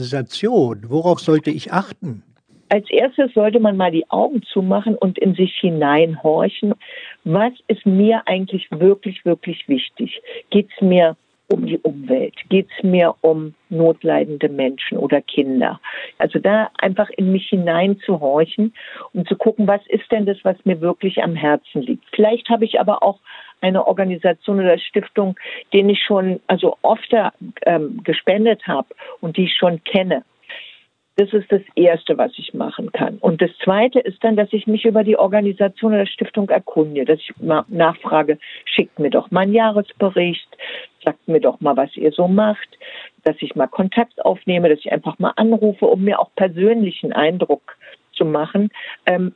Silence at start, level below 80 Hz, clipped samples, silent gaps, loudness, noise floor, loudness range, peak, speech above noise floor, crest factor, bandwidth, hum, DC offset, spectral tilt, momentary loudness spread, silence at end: 0 s; -68 dBFS; under 0.1%; none; -17 LUFS; -47 dBFS; 2 LU; 0 dBFS; 30 dB; 18 dB; 9 kHz; none; under 0.1%; -8 dB/octave; 9 LU; 0.05 s